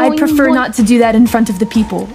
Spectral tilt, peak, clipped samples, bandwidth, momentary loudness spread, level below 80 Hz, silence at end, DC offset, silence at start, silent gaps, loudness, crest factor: -5.5 dB/octave; 0 dBFS; under 0.1%; 16 kHz; 5 LU; -36 dBFS; 0 s; under 0.1%; 0 s; none; -11 LUFS; 10 dB